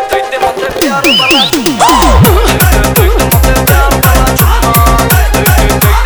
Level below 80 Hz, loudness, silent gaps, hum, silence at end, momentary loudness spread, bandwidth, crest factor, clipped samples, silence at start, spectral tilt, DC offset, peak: -12 dBFS; -7 LUFS; none; none; 0 s; 6 LU; over 20 kHz; 6 dB; 2%; 0 s; -4 dB/octave; under 0.1%; 0 dBFS